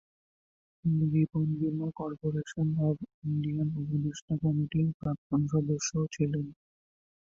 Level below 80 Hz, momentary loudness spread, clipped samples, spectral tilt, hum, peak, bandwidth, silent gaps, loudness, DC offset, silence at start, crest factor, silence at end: -60 dBFS; 7 LU; under 0.1%; -7 dB/octave; none; -16 dBFS; 7.6 kHz; 3.14-3.22 s, 4.22-4.28 s, 4.94-5.00 s, 5.18-5.30 s; -31 LUFS; under 0.1%; 0.85 s; 14 dB; 0.7 s